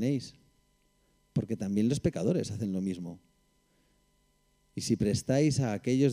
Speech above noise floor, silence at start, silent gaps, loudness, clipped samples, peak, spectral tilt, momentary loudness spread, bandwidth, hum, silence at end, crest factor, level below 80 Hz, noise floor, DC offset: 41 dB; 0 s; none; -31 LUFS; under 0.1%; -14 dBFS; -6.5 dB/octave; 12 LU; 15.5 kHz; 50 Hz at -55 dBFS; 0 s; 18 dB; -58 dBFS; -70 dBFS; under 0.1%